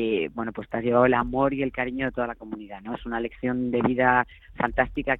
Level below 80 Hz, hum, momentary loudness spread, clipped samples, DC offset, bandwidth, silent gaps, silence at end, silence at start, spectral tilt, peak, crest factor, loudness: -46 dBFS; none; 14 LU; under 0.1%; under 0.1%; 4 kHz; none; 0 s; 0 s; -9.5 dB/octave; -6 dBFS; 20 dB; -25 LUFS